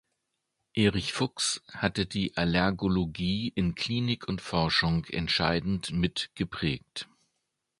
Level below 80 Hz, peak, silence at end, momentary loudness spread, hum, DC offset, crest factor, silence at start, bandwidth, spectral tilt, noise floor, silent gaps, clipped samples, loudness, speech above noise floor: -48 dBFS; -8 dBFS; 0.75 s; 7 LU; none; under 0.1%; 22 dB; 0.75 s; 11.5 kHz; -4.5 dB/octave; -81 dBFS; none; under 0.1%; -29 LUFS; 52 dB